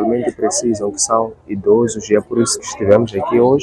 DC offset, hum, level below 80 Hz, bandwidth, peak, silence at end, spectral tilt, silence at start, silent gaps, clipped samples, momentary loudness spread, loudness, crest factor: under 0.1%; none; -50 dBFS; 12 kHz; 0 dBFS; 0 s; -4.5 dB/octave; 0 s; none; under 0.1%; 5 LU; -16 LUFS; 16 dB